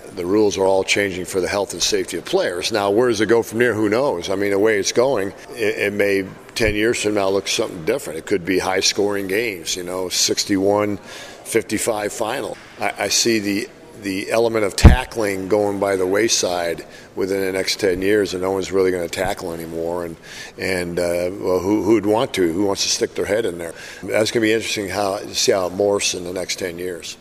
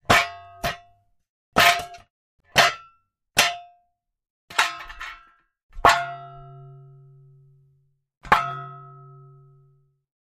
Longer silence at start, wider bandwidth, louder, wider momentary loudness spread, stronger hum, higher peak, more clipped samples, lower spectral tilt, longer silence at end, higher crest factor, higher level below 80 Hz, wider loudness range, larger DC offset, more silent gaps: about the same, 0 s vs 0.1 s; about the same, 16 kHz vs 15.5 kHz; about the same, -19 LUFS vs -21 LUFS; second, 9 LU vs 22 LU; neither; about the same, 0 dBFS vs -2 dBFS; neither; first, -4 dB/octave vs -2 dB/octave; second, 0.05 s vs 1.4 s; about the same, 20 dB vs 24 dB; first, -30 dBFS vs -48 dBFS; second, 3 LU vs 8 LU; neither; second, none vs 1.29-1.52 s, 2.10-2.39 s, 4.30-4.48 s, 5.63-5.69 s, 8.17-8.21 s